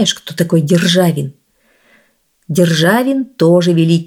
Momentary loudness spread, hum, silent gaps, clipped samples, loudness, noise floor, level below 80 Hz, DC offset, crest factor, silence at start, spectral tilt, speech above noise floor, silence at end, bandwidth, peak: 8 LU; none; none; under 0.1%; -13 LUFS; -57 dBFS; -60 dBFS; under 0.1%; 12 dB; 0 s; -5.5 dB/octave; 45 dB; 0 s; 17.5 kHz; 0 dBFS